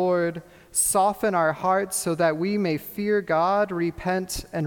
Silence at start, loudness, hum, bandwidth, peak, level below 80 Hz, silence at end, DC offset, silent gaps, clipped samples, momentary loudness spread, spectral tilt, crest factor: 0 s; -24 LUFS; none; 19 kHz; -10 dBFS; -50 dBFS; 0 s; under 0.1%; none; under 0.1%; 6 LU; -4.5 dB/octave; 14 dB